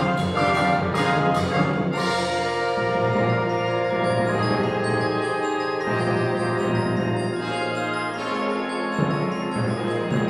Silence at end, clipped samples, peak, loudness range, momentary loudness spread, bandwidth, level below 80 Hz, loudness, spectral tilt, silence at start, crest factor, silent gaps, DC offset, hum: 0 s; under 0.1%; -8 dBFS; 3 LU; 4 LU; 12.5 kHz; -54 dBFS; -23 LUFS; -6 dB/octave; 0 s; 16 dB; none; under 0.1%; none